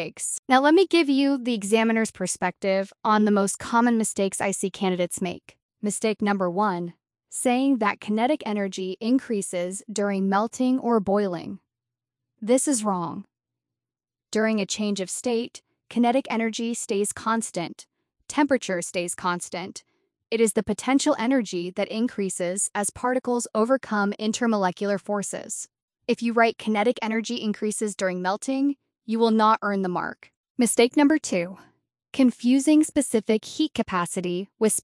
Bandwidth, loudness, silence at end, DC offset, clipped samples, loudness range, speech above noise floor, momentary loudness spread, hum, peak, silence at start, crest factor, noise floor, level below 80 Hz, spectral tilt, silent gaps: 12 kHz; -24 LUFS; 0 s; under 0.1%; under 0.1%; 4 LU; over 66 dB; 10 LU; none; -6 dBFS; 0 s; 18 dB; under -90 dBFS; -66 dBFS; -4 dB/octave; 0.39-0.43 s, 5.62-5.69 s, 25.82-25.88 s, 30.37-30.44 s, 30.50-30.55 s